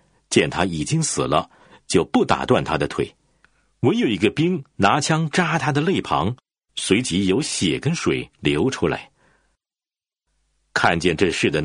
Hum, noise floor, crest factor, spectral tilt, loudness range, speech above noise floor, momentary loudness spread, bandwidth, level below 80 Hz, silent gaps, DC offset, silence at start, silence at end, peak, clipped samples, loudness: none; under -90 dBFS; 20 dB; -4.5 dB/octave; 3 LU; over 70 dB; 6 LU; 10.5 kHz; -48 dBFS; none; under 0.1%; 0.3 s; 0 s; -2 dBFS; under 0.1%; -21 LUFS